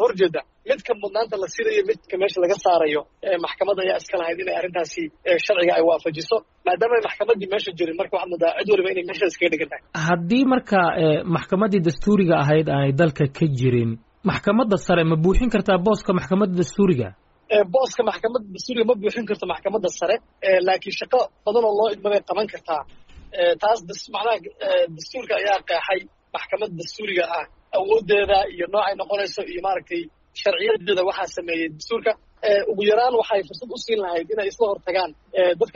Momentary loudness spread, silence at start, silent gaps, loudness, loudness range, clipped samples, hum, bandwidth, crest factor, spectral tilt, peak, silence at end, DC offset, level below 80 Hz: 8 LU; 0 s; none; -21 LUFS; 4 LU; under 0.1%; none; 7.6 kHz; 14 dB; -4.5 dB/octave; -6 dBFS; 0.05 s; under 0.1%; -42 dBFS